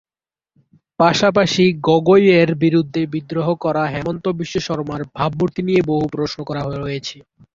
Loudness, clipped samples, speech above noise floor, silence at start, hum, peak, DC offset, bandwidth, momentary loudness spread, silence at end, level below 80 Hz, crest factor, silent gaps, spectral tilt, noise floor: -17 LUFS; under 0.1%; over 73 dB; 1 s; none; -2 dBFS; under 0.1%; 7.8 kHz; 11 LU; 0.35 s; -50 dBFS; 16 dB; none; -6 dB/octave; under -90 dBFS